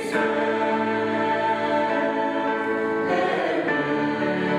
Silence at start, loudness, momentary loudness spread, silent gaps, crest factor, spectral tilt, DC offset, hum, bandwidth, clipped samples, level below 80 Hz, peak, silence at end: 0 s; -23 LUFS; 2 LU; none; 12 dB; -6 dB/octave; under 0.1%; none; 12 kHz; under 0.1%; -66 dBFS; -10 dBFS; 0 s